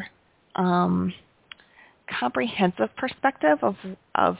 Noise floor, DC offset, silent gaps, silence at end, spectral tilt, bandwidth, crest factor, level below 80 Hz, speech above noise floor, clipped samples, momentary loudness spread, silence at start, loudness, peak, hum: -55 dBFS; under 0.1%; none; 0 s; -10.5 dB/octave; 4 kHz; 20 dB; -58 dBFS; 31 dB; under 0.1%; 18 LU; 0 s; -25 LUFS; -6 dBFS; none